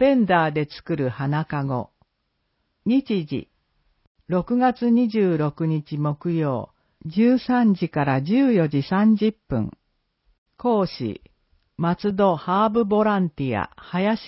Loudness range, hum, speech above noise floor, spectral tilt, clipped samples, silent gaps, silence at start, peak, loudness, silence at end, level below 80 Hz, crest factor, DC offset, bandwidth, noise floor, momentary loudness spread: 6 LU; none; 53 dB; -12 dB/octave; under 0.1%; 4.07-4.15 s, 10.38-10.46 s; 0 s; -6 dBFS; -22 LUFS; 0 s; -54 dBFS; 16 dB; under 0.1%; 5.8 kHz; -73 dBFS; 10 LU